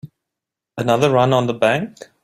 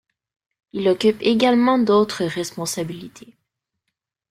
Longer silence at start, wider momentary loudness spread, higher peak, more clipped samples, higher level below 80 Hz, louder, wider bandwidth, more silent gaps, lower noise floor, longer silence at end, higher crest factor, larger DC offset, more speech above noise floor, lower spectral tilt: second, 0.05 s vs 0.75 s; about the same, 14 LU vs 13 LU; about the same, -2 dBFS vs -4 dBFS; neither; about the same, -58 dBFS vs -62 dBFS; about the same, -17 LUFS vs -19 LUFS; about the same, 14.5 kHz vs 15 kHz; neither; first, -84 dBFS vs -80 dBFS; second, 0.35 s vs 1.2 s; about the same, 16 dB vs 16 dB; neither; first, 67 dB vs 61 dB; about the same, -6 dB/octave vs -5 dB/octave